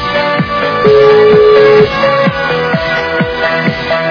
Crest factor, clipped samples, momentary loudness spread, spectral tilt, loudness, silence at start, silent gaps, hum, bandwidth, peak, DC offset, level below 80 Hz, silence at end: 8 dB; 1%; 8 LU; -6.5 dB/octave; -9 LUFS; 0 s; none; none; 5.4 kHz; 0 dBFS; under 0.1%; -36 dBFS; 0 s